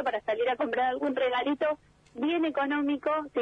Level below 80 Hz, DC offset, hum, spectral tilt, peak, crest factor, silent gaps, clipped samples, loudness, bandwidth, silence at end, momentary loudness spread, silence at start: -68 dBFS; under 0.1%; 50 Hz at -65 dBFS; -5.5 dB/octave; -18 dBFS; 12 dB; none; under 0.1%; -29 LUFS; 6.4 kHz; 0 s; 4 LU; 0 s